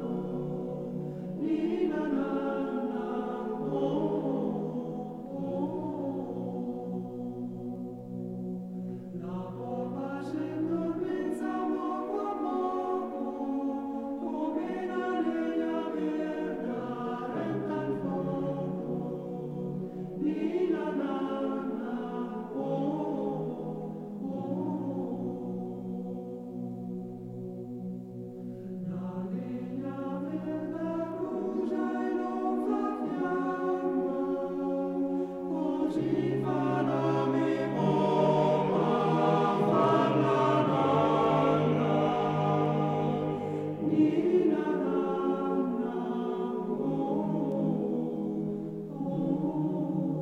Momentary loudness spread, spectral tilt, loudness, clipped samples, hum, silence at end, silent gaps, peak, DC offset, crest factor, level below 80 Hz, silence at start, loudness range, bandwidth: 12 LU; -8.5 dB/octave; -31 LUFS; under 0.1%; none; 0 s; none; -12 dBFS; under 0.1%; 18 dB; -68 dBFS; 0 s; 11 LU; 9.8 kHz